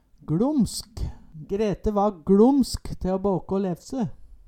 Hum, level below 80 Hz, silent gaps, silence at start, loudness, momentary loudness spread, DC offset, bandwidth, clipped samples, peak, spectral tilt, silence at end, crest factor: none; -40 dBFS; none; 0.3 s; -24 LUFS; 14 LU; under 0.1%; 16 kHz; under 0.1%; -6 dBFS; -7 dB/octave; 0.15 s; 18 dB